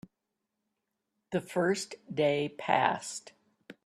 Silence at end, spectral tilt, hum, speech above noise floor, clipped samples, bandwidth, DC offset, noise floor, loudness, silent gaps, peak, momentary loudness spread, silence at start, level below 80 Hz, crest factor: 0.15 s; -4.5 dB/octave; none; 55 dB; under 0.1%; 13.5 kHz; under 0.1%; -85 dBFS; -31 LUFS; none; -8 dBFS; 10 LU; 1.3 s; -76 dBFS; 24 dB